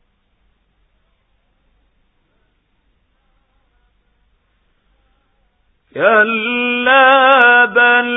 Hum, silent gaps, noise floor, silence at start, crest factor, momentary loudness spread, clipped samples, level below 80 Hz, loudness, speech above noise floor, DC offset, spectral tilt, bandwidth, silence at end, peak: none; none; -61 dBFS; 5.95 s; 16 dB; 8 LU; under 0.1%; -60 dBFS; -10 LUFS; 50 dB; under 0.1%; -5.5 dB/octave; 3.9 kHz; 0 s; 0 dBFS